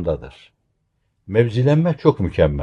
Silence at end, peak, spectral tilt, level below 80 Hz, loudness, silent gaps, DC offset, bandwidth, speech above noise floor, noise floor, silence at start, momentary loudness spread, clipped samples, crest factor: 0 s; -2 dBFS; -9 dB/octave; -38 dBFS; -18 LUFS; none; under 0.1%; 7.8 kHz; 51 dB; -69 dBFS; 0 s; 8 LU; under 0.1%; 18 dB